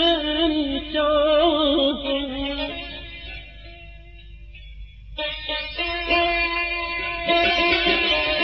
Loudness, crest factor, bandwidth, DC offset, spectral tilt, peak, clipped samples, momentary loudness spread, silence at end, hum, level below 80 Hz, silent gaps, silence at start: -21 LUFS; 16 dB; 6.4 kHz; under 0.1%; -1 dB/octave; -8 dBFS; under 0.1%; 18 LU; 0 s; none; -40 dBFS; none; 0 s